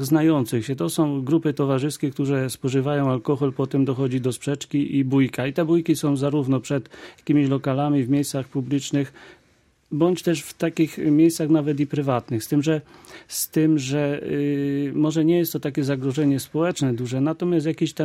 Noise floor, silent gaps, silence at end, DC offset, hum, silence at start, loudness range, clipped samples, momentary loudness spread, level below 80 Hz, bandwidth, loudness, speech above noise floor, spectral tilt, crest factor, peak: -61 dBFS; none; 0 s; under 0.1%; none; 0 s; 2 LU; under 0.1%; 6 LU; -62 dBFS; 16 kHz; -22 LUFS; 39 dB; -6.5 dB/octave; 16 dB; -6 dBFS